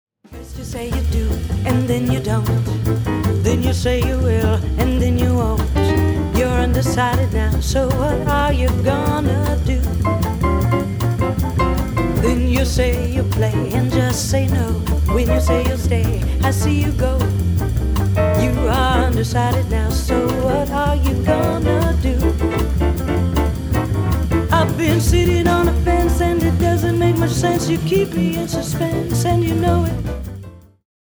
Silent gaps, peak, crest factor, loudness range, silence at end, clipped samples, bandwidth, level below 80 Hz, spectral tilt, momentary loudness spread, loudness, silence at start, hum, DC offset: none; -2 dBFS; 14 dB; 2 LU; 0.4 s; under 0.1%; over 20 kHz; -22 dBFS; -6.5 dB/octave; 3 LU; -18 LUFS; 0.3 s; none; under 0.1%